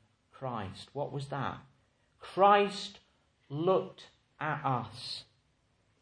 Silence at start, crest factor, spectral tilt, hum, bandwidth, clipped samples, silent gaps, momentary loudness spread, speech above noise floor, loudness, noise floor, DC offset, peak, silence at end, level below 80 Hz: 0.4 s; 24 dB; -6 dB/octave; none; 10.5 kHz; under 0.1%; none; 19 LU; 41 dB; -32 LUFS; -72 dBFS; under 0.1%; -10 dBFS; 0.8 s; -72 dBFS